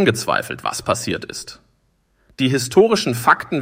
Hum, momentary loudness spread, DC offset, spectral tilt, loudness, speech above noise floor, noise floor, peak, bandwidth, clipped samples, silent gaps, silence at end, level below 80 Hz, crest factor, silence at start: none; 13 LU; under 0.1%; -4.5 dB/octave; -18 LUFS; 44 dB; -63 dBFS; -2 dBFS; 16.5 kHz; under 0.1%; none; 0 s; -54 dBFS; 18 dB; 0 s